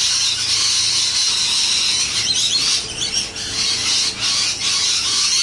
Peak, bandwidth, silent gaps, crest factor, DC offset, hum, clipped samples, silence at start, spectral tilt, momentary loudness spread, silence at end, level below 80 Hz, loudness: -6 dBFS; 11.5 kHz; none; 12 dB; under 0.1%; none; under 0.1%; 0 s; 1 dB/octave; 5 LU; 0 s; -48 dBFS; -15 LUFS